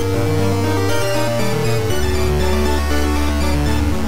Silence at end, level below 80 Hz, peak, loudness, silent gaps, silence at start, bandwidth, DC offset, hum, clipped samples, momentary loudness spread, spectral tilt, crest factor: 0 s; -22 dBFS; -4 dBFS; -18 LUFS; none; 0 s; 16 kHz; 8%; none; under 0.1%; 1 LU; -5.5 dB/octave; 12 dB